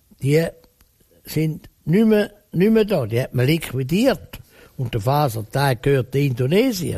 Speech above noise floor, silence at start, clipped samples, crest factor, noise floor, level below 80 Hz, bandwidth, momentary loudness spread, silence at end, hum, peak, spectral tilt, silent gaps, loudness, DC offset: 38 dB; 0.2 s; under 0.1%; 14 dB; -57 dBFS; -46 dBFS; 15 kHz; 9 LU; 0 s; none; -6 dBFS; -6.5 dB/octave; none; -20 LUFS; under 0.1%